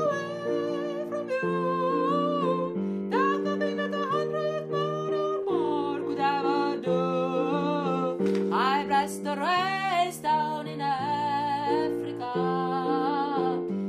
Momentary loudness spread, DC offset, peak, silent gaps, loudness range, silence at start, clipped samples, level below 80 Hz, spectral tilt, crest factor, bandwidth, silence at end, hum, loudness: 5 LU; under 0.1%; -12 dBFS; none; 2 LU; 0 s; under 0.1%; -72 dBFS; -6 dB/octave; 14 dB; 15 kHz; 0 s; none; -27 LUFS